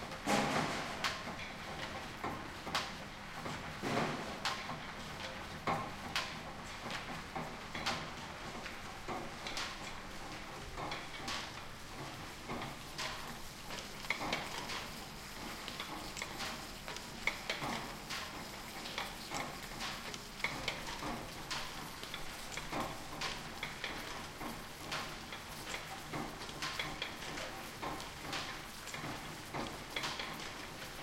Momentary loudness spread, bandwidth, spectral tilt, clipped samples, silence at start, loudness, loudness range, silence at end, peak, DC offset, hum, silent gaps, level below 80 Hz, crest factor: 7 LU; 16.5 kHz; -3 dB/octave; under 0.1%; 0 s; -42 LUFS; 3 LU; 0 s; -16 dBFS; under 0.1%; none; none; -56 dBFS; 26 dB